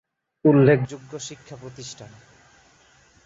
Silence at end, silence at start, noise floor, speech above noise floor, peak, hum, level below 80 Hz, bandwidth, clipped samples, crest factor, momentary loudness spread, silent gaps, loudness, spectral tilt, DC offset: 1.2 s; 0.45 s; -56 dBFS; 35 dB; -2 dBFS; none; -62 dBFS; 8 kHz; under 0.1%; 22 dB; 24 LU; none; -19 LUFS; -7 dB/octave; under 0.1%